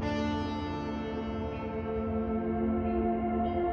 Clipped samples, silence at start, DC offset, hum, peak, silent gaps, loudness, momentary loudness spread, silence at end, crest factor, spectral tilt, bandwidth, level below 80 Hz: under 0.1%; 0 s; under 0.1%; none; -18 dBFS; none; -32 LUFS; 5 LU; 0 s; 14 dB; -8 dB/octave; 6.8 kHz; -44 dBFS